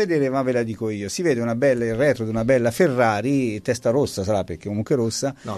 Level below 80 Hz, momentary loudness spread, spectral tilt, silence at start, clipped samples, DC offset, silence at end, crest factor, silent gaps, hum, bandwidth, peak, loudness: -52 dBFS; 7 LU; -6 dB/octave; 0 s; under 0.1%; under 0.1%; 0 s; 16 dB; none; none; 13.5 kHz; -6 dBFS; -22 LUFS